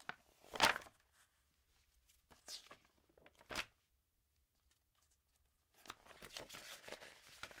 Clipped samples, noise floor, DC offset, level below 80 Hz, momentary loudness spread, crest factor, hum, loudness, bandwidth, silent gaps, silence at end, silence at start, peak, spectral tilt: under 0.1%; -82 dBFS; under 0.1%; -74 dBFS; 27 LU; 32 dB; none; -43 LUFS; 16 kHz; none; 0 s; 0 s; -18 dBFS; -1 dB/octave